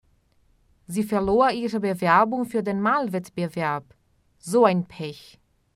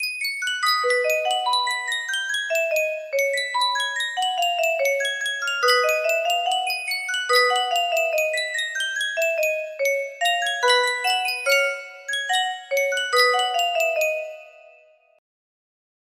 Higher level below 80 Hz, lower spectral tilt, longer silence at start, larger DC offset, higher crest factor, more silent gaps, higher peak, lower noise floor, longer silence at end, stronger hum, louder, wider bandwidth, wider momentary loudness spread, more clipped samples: first, -54 dBFS vs -76 dBFS; first, -6 dB/octave vs 3.5 dB/octave; first, 0.9 s vs 0 s; neither; about the same, 20 dB vs 18 dB; neither; about the same, -4 dBFS vs -4 dBFS; first, -63 dBFS vs -54 dBFS; second, 0.55 s vs 1.65 s; neither; about the same, -23 LUFS vs -21 LUFS; about the same, 15.5 kHz vs 16 kHz; first, 14 LU vs 6 LU; neither